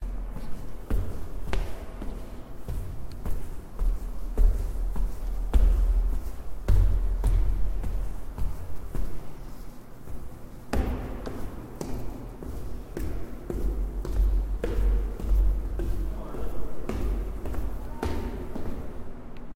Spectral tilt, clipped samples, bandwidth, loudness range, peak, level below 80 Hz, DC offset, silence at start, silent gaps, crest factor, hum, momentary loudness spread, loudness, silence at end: -7.5 dB/octave; under 0.1%; 15 kHz; 8 LU; -8 dBFS; -28 dBFS; under 0.1%; 0 s; none; 18 dB; none; 15 LU; -33 LUFS; 0 s